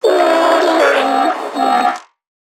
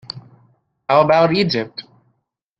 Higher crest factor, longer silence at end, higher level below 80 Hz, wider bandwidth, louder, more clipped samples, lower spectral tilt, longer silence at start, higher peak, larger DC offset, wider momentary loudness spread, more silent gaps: second, 12 dB vs 18 dB; second, 0.45 s vs 0.8 s; second, -72 dBFS vs -58 dBFS; first, 16.5 kHz vs 7.8 kHz; first, -13 LUFS vs -16 LUFS; neither; second, -2.5 dB/octave vs -7 dB/octave; about the same, 0.05 s vs 0.15 s; about the same, 0 dBFS vs 0 dBFS; neither; second, 6 LU vs 21 LU; neither